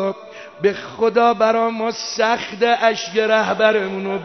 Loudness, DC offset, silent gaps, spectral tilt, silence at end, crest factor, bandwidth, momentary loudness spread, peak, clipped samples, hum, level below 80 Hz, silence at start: -18 LUFS; under 0.1%; none; -4 dB/octave; 0 s; 16 dB; 6.4 kHz; 8 LU; -2 dBFS; under 0.1%; none; -64 dBFS; 0 s